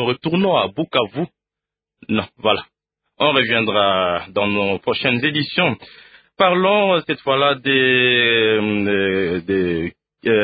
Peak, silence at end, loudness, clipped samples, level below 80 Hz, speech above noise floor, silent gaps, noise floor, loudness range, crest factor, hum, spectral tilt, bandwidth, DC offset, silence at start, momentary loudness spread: -2 dBFS; 0 s; -17 LUFS; under 0.1%; -50 dBFS; 69 dB; none; -87 dBFS; 5 LU; 18 dB; none; -10.5 dB/octave; 5 kHz; under 0.1%; 0 s; 9 LU